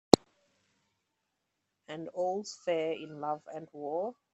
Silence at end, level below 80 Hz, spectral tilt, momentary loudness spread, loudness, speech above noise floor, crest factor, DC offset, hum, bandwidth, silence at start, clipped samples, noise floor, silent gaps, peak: 0.2 s; -64 dBFS; -4.5 dB/octave; 15 LU; -34 LUFS; 47 dB; 34 dB; under 0.1%; none; 15.5 kHz; 0.15 s; under 0.1%; -83 dBFS; none; 0 dBFS